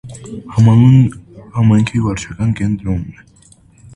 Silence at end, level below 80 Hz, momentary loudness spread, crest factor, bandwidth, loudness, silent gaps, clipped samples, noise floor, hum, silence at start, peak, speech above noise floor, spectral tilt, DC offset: 0.85 s; -36 dBFS; 17 LU; 14 dB; 10.5 kHz; -13 LUFS; none; under 0.1%; -46 dBFS; none; 0.05 s; 0 dBFS; 34 dB; -8 dB/octave; under 0.1%